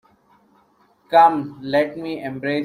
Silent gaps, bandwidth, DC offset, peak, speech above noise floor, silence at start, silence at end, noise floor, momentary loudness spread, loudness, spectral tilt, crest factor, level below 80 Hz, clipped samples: none; 14.5 kHz; under 0.1%; -2 dBFS; 40 dB; 1.1 s; 0 s; -58 dBFS; 14 LU; -19 LUFS; -6.5 dB/octave; 18 dB; -64 dBFS; under 0.1%